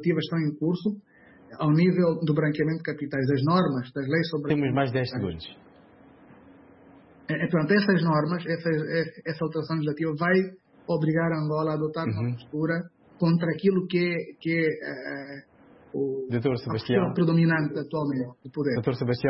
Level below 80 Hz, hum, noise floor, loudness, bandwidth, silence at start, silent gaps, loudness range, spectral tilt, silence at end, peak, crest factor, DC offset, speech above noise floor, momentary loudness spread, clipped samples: -62 dBFS; none; -53 dBFS; -26 LUFS; 5.8 kHz; 0 s; none; 4 LU; -11.5 dB/octave; 0 s; -8 dBFS; 18 dB; under 0.1%; 28 dB; 11 LU; under 0.1%